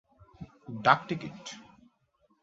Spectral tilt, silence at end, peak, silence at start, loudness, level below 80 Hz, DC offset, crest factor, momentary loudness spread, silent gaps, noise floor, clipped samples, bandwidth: -3 dB/octave; 0.8 s; -6 dBFS; 0.4 s; -28 LUFS; -66 dBFS; under 0.1%; 28 dB; 24 LU; none; -71 dBFS; under 0.1%; 7.6 kHz